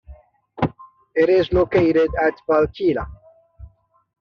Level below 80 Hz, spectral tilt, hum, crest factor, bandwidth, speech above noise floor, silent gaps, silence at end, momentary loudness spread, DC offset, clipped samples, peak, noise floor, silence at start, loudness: -40 dBFS; -5.5 dB/octave; none; 16 dB; 6.4 kHz; 28 dB; none; 0.55 s; 10 LU; under 0.1%; under 0.1%; -4 dBFS; -46 dBFS; 0.1 s; -19 LUFS